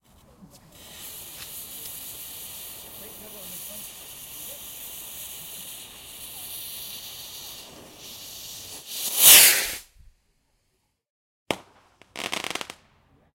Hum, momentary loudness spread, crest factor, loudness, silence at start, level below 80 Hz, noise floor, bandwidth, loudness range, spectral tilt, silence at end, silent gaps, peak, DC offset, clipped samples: none; 22 LU; 28 dB; -17 LUFS; 0.4 s; -60 dBFS; -73 dBFS; 16.5 kHz; 18 LU; 1.5 dB/octave; 0.6 s; 11.10-11.46 s; 0 dBFS; under 0.1%; under 0.1%